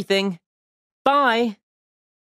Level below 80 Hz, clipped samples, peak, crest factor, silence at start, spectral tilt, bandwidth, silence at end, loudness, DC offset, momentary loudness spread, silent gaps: -70 dBFS; under 0.1%; -4 dBFS; 20 dB; 0 s; -4.5 dB/octave; 15 kHz; 0.7 s; -21 LUFS; under 0.1%; 11 LU; 0.46-1.05 s